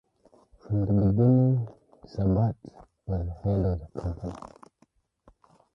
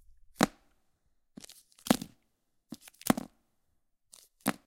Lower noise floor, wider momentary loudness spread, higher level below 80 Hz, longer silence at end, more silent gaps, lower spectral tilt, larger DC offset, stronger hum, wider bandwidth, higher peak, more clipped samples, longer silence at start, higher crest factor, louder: second, -67 dBFS vs -77 dBFS; about the same, 20 LU vs 20 LU; first, -42 dBFS vs -64 dBFS; first, 1.4 s vs 0.15 s; neither; first, -11.5 dB/octave vs -4 dB/octave; neither; neither; second, 6 kHz vs 17 kHz; second, -10 dBFS vs -4 dBFS; neither; first, 0.7 s vs 0.4 s; second, 18 dB vs 34 dB; first, -26 LUFS vs -32 LUFS